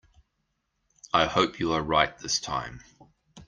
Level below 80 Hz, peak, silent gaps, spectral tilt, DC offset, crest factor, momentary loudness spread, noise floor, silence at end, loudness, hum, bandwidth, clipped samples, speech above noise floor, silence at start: -52 dBFS; -4 dBFS; none; -3 dB/octave; under 0.1%; 24 dB; 9 LU; -78 dBFS; 0.05 s; -26 LUFS; none; 10.5 kHz; under 0.1%; 51 dB; 1.15 s